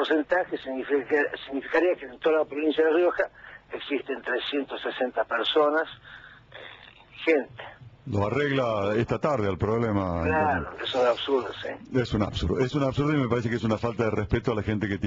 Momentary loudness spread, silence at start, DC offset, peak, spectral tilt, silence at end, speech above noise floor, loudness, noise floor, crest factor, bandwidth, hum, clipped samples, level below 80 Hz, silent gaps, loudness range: 13 LU; 0 s; under 0.1%; -10 dBFS; -7 dB/octave; 0 s; 23 dB; -26 LUFS; -49 dBFS; 16 dB; 7.6 kHz; none; under 0.1%; -48 dBFS; none; 3 LU